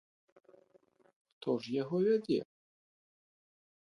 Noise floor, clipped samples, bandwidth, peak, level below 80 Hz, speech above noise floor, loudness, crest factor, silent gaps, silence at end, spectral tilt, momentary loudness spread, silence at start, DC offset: -68 dBFS; under 0.1%; 11 kHz; -20 dBFS; -82 dBFS; 36 dB; -34 LUFS; 18 dB; none; 1.45 s; -7.5 dB/octave; 10 LU; 1.45 s; under 0.1%